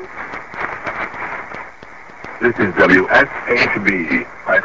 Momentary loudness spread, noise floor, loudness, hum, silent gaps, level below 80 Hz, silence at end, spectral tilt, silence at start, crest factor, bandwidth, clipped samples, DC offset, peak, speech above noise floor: 21 LU; -38 dBFS; -16 LUFS; none; none; -46 dBFS; 0 s; -6 dB/octave; 0 s; 18 dB; 8 kHz; under 0.1%; 0.8%; 0 dBFS; 23 dB